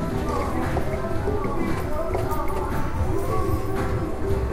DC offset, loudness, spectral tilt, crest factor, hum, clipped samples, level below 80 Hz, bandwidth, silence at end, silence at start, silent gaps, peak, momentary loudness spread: under 0.1%; -26 LUFS; -7 dB/octave; 14 dB; none; under 0.1%; -30 dBFS; 16 kHz; 0 s; 0 s; none; -10 dBFS; 2 LU